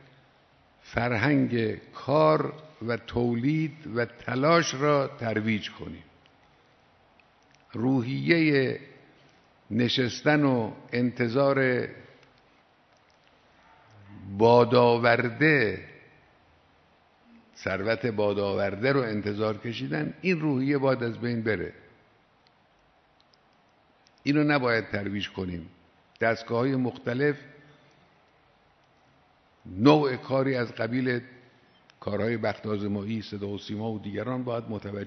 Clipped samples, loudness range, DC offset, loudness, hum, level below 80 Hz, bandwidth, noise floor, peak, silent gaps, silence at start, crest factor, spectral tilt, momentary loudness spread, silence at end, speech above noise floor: under 0.1%; 7 LU; under 0.1%; -26 LUFS; none; -62 dBFS; 6.4 kHz; -63 dBFS; -6 dBFS; none; 0.85 s; 22 dB; -6.5 dB/octave; 13 LU; 0 s; 37 dB